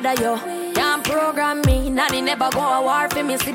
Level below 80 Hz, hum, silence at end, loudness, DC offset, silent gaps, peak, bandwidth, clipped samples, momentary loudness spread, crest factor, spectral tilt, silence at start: -32 dBFS; none; 0 s; -19 LUFS; under 0.1%; none; -6 dBFS; 17 kHz; under 0.1%; 3 LU; 14 dB; -4 dB/octave; 0 s